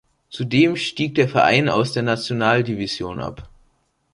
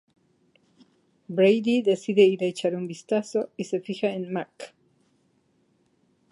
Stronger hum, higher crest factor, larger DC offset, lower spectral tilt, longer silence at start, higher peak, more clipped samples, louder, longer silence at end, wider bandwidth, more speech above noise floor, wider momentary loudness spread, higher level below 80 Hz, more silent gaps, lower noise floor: neither; about the same, 18 dB vs 20 dB; neither; about the same, -6 dB/octave vs -6 dB/octave; second, 0.3 s vs 1.3 s; first, -2 dBFS vs -6 dBFS; neither; first, -19 LUFS vs -24 LUFS; second, 0.65 s vs 1.65 s; about the same, 11.5 kHz vs 11.5 kHz; about the same, 44 dB vs 43 dB; about the same, 14 LU vs 13 LU; first, -50 dBFS vs -78 dBFS; neither; about the same, -64 dBFS vs -67 dBFS